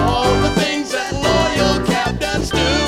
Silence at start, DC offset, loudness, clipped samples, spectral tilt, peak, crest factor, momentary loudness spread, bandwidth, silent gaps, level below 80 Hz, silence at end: 0 s; under 0.1%; -17 LUFS; under 0.1%; -4.5 dB/octave; -2 dBFS; 14 dB; 4 LU; 16.5 kHz; none; -28 dBFS; 0 s